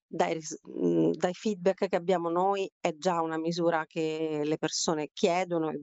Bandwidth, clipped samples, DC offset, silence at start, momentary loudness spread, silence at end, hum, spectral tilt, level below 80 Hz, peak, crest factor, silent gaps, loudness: 8.2 kHz; under 0.1%; under 0.1%; 0.1 s; 4 LU; 0 s; none; -4.5 dB/octave; -76 dBFS; -10 dBFS; 20 dB; 2.72-2.81 s; -29 LUFS